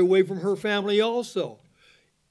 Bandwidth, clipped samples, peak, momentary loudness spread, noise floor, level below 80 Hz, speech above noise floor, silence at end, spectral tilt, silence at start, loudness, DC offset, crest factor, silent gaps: 11 kHz; under 0.1%; -8 dBFS; 9 LU; -60 dBFS; -72 dBFS; 37 dB; 0.75 s; -5.5 dB/octave; 0 s; -25 LUFS; under 0.1%; 16 dB; none